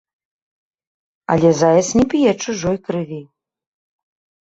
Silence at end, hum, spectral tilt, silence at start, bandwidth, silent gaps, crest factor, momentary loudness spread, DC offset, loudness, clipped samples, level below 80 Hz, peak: 1.2 s; none; -5.5 dB/octave; 1.3 s; 8 kHz; none; 18 dB; 15 LU; under 0.1%; -16 LUFS; under 0.1%; -48 dBFS; -2 dBFS